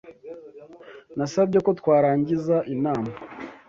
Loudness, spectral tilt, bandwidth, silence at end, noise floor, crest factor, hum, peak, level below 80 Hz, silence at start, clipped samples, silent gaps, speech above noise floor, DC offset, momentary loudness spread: -23 LUFS; -7.5 dB/octave; 7.6 kHz; 0.1 s; -45 dBFS; 16 dB; none; -8 dBFS; -62 dBFS; 0.05 s; under 0.1%; none; 24 dB; under 0.1%; 22 LU